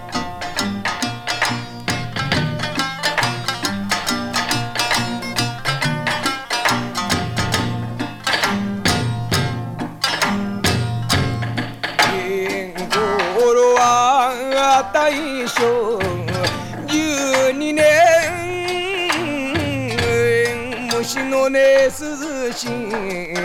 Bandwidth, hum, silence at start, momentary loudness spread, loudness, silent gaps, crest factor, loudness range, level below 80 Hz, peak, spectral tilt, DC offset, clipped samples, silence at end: 19 kHz; none; 0 s; 10 LU; -18 LUFS; none; 18 dB; 4 LU; -44 dBFS; -2 dBFS; -4 dB/octave; under 0.1%; under 0.1%; 0 s